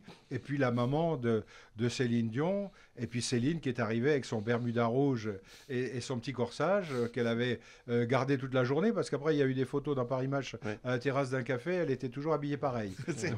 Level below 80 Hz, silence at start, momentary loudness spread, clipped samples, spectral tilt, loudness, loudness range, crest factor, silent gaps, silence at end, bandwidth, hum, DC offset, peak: -64 dBFS; 0.05 s; 8 LU; under 0.1%; -6.5 dB/octave; -33 LUFS; 2 LU; 18 dB; none; 0 s; 11 kHz; none; under 0.1%; -16 dBFS